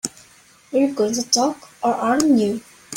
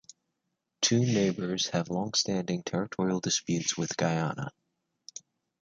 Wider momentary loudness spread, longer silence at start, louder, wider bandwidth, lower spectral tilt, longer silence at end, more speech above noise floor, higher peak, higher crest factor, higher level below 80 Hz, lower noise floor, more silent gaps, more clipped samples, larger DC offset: second, 8 LU vs 15 LU; second, 0.05 s vs 0.8 s; first, -20 LUFS vs -29 LUFS; first, 16.5 kHz vs 9.4 kHz; about the same, -3 dB/octave vs -4 dB/octave; second, 0 s vs 0.4 s; second, 32 dB vs 53 dB; first, -2 dBFS vs -12 dBFS; about the same, 18 dB vs 20 dB; about the same, -62 dBFS vs -66 dBFS; second, -51 dBFS vs -83 dBFS; neither; neither; neither